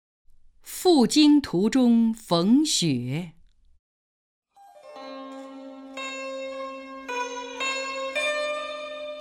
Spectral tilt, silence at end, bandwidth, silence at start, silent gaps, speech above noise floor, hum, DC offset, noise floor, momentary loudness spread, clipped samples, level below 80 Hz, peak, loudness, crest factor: -4.5 dB/octave; 0 s; 17 kHz; 0.65 s; 3.79-4.42 s; 29 dB; none; under 0.1%; -49 dBFS; 21 LU; under 0.1%; -60 dBFS; -8 dBFS; -24 LUFS; 18 dB